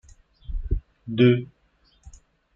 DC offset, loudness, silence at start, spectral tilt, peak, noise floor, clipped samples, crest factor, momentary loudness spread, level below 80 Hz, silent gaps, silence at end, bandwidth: under 0.1%; -23 LUFS; 0.5 s; -8.5 dB/octave; -6 dBFS; -63 dBFS; under 0.1%; 20 dB; 19 LU; -34 dBFS; none; 0.45 s; 7.4 kHz